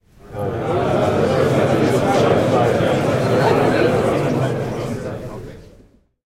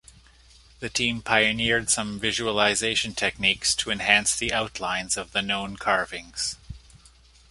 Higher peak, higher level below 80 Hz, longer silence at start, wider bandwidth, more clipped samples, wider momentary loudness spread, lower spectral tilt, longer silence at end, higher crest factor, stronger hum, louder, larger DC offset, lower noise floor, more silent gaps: about the same, -4 dBFS vs -2 dBFS; first, -44 dBFS vs -50 dBFS; second, 0.25 s vs 0.8 s; first, 16 kHz vs 12 kHz; neither; first, 13 LU vs 9 LU; first, -6.5 dB/octave vs -1.5 dB/octave; about the same, 0.65 s vs 0.55 s; second, 14 dB vs 24 dB; neither; first, -17 LUFS vs -23 LUFS; neither; second, -50 dBFS vs -54 dBFS; neither